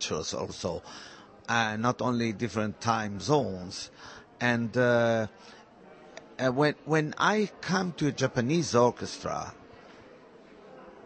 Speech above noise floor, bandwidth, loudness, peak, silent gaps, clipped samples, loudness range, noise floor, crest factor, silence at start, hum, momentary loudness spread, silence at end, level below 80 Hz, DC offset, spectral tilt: 24 dB; 8.8 kHz; -29 LUFS; -10 dBFS; none; under 0.1%; 3 LU; -53 dBFS; 20 dB; 0 s; none; 20 LU; 0 s; -62 dBFS; under 0.1%; -5 dB/octave